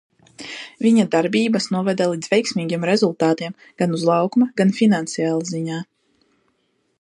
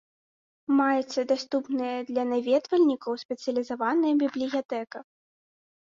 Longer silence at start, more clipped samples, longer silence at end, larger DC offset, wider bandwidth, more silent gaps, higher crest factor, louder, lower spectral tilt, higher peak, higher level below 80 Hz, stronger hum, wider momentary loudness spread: second, 0.4 s vs 0.7 s; neither; first, 1.2 s vs 0.85 s; neither; first, 11.5 kHz vs 7.6 kHz; second, none vs 3.25-3.29 s, 4.65-4.69 s; about the same, 16 dB vs 16 dB; first, -19 LUFS vs -27 LUFS; first, -5.5 dB/octave vs -4 dB/octave; first, -4 dBFS vs -12 dBFS; first, -68 dBFS vs -74 dBFS; neither; first, 14 LU vs 10 LU